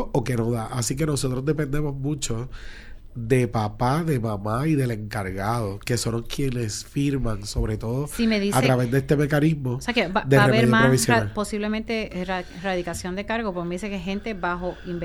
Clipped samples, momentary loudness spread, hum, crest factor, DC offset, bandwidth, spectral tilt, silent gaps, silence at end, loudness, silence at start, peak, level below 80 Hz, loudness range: under 0.1%; 11 LU; none; 20 dB; under 0.1%; 16 kHz; -5.5 dB/octave; none; 0 s; -24 LUFS; 0 s; -4 dBFS; -38 dBFS; 7 LU